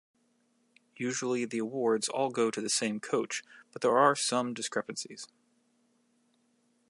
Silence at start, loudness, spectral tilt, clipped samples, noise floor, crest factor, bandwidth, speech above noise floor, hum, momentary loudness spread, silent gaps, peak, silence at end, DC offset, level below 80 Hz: 1 s; -30 LUFS; -3 dB/octave; under 0.1%; -72 dBFS; 22 dB; 11.5 kHz; 41 dB; none; 14 LU; none; -10 dBFS; 1.65 s; under 0.1%; -86 dBFS